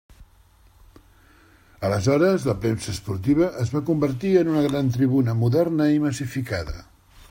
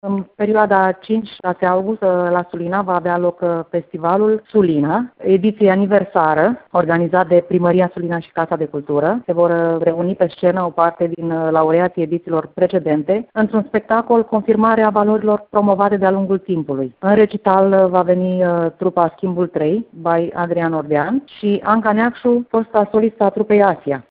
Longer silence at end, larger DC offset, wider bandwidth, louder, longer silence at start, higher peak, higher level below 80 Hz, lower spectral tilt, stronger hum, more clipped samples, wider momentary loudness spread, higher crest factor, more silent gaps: first, 0.5 s vs 0.1 s; neither; first, 16.5 kHz vs 4.8 kHz; second, -22 LUFS vs -16 LUFS; first, 0.2 s vs 0.05 s; second, -6 dBFS vs 0 dBFS; first, -46 dBFS vs -56 dBFS; about the same, -7 dB/octave vs -6.5 dB/octave; neither; neither; first, 10 LU vs 7 LU; about the same, 16 dB vs 16 dB; neither